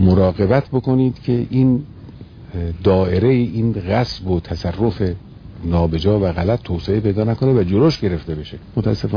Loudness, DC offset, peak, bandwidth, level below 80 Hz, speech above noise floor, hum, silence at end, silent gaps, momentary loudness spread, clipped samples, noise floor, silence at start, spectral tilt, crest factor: -18 LUFS; under 0.1%; -2 dBFS; 5.2 kHz; -36 dBFS; 20 dB; none; 0 s; none; 12 LU; under 0.1%; -37 dBFS; 0 s; -9 dB/octave; 16 dB